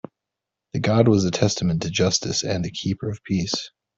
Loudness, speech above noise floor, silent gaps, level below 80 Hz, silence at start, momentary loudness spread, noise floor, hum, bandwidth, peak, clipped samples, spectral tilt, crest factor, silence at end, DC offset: -22 LUFS; 63 dB; none; -52 dBFS; 0.75 s; 9 LU; -85 dBFS; none; 8 kHz; -4 dBFS; under 0.1%; -5 dB/octave; 18 dB; 0.3 s; under 0.1%